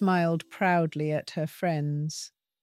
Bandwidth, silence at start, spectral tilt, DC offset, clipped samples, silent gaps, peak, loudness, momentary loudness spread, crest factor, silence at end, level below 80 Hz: 14.5 kHz; 0 s; -6.5 dB/octave; under 0.1%; under 0.1%; none; -12 dBFS; -28 LUFS; 9 LU; 16 dB; 0.35 s; -74 dBFS